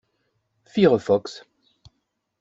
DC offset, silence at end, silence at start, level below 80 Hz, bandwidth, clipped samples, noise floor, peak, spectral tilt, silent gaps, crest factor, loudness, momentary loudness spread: under 0.1%; 1 s; 0.75 s; -62 dBFS; 7.8 kHz; under 0.1%; -75 dBFS; -4 dBFS; -7 dB/octave; none; 20 dB; -21 LUFS; 21 LU